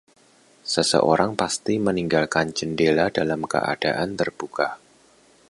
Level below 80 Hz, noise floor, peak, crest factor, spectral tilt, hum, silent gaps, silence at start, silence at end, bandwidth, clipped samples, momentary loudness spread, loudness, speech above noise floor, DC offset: -56 dBFS; -56 dBFS; -2 dBFS; 20 dB; -4 dB/octave; none; none; 0.65 s; 0.75 s; 11.5 kHz; under 0.1%; 8 LU; -22 LUFS; 34 dB; under 0.1%